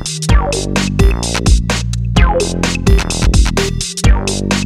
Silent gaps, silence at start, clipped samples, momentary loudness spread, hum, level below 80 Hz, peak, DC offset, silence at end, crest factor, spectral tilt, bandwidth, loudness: none; 0 s; under 0.1%; 3 LU; none; -14 dBFS; 0 dBFS; under 0.1%; 0 s; 12 dB; -4.5 dB/octave; 13.5 kHz; -14 LUFS